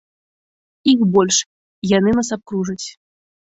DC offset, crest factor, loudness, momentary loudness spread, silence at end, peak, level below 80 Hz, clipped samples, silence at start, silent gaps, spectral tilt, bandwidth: under 0.1%; 16 dB; -17 LUFS; 15 LU; 0.6 s; -2 dBFS; -52 dBFS; under 0.1%; 0.85 s; 1.46-1.82 s; -4 dB/octave; 8.2 kHz